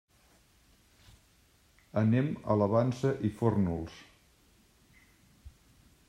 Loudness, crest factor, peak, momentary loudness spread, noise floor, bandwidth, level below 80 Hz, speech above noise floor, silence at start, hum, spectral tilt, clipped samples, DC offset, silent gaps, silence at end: -30 LUFS; 20 dB; -12 dBFS; 11 LU; -65 dBFS; 12.5 kHz; -62 dBFS; 36 dB; 1.95 s; none; -8.5 dB/octave; under 0.1%; under 0.1%; none; 0.6 s